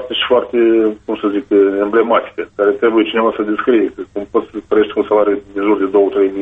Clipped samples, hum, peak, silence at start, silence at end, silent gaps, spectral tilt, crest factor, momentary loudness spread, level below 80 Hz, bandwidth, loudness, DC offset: under 0.1%; none; 0 dBFS; 0 s; 0 s; none; -7 dB/octave; 14 dB; 7 LU; -52 dBFS; 3.9 kHz; -14 LUFS; under 0.1%